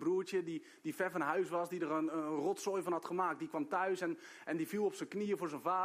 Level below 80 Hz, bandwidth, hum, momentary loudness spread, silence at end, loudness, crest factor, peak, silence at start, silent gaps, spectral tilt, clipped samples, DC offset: -86 dBFS; 15.5 kHz; none; 6 LU; 0 s; -38 LUFS; 16 dB; -20 dBFS; 0 s; none; -5.5 dB/octave; under 0.1%; under 0.1%